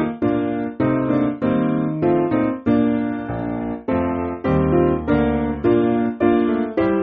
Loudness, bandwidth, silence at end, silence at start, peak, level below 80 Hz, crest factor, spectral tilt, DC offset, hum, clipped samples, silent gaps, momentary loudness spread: -20 LUFS; 4.7 kHz; 0 s; 0 s; -4 dBFS; -38 dBFS; 14 dB; -7.5 dB/octave; under 0.1%; none; under 0.1%; none; 6 LU